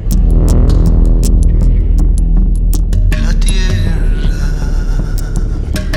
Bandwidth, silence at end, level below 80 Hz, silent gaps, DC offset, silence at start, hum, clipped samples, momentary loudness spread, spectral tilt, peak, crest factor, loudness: 16 kHz; 0 s; -10 dBFS; none; under 0.1%; 0 s; none; under 0.1%; 7 LU; -6.5 dB/octave; 0 dBFS; 8 dB; -14 LUFS